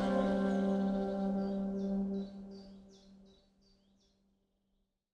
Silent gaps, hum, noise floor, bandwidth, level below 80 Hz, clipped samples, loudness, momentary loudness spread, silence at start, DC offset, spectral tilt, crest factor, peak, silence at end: none; none; -80 dBFS; 8.8 kHz; -60 dBFS; under 0.1%; -35 LUFS; 18 LU; 0 s; under 0.1%; -8.5 dB/octave; 18 dB; -20 dBFS; 2 s